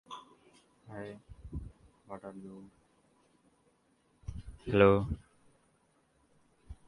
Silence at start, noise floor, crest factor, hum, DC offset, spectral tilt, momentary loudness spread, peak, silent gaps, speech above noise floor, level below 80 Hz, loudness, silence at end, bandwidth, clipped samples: 0.1 s; -71 dBFS; 26 dB; none; under 0.1%; -8 dB/octave; 26 LU; -10 dBFS; none; 41 dB; -52 dBFS; -30 LUFS; 0.15 s; 11 kHz; under 0.1%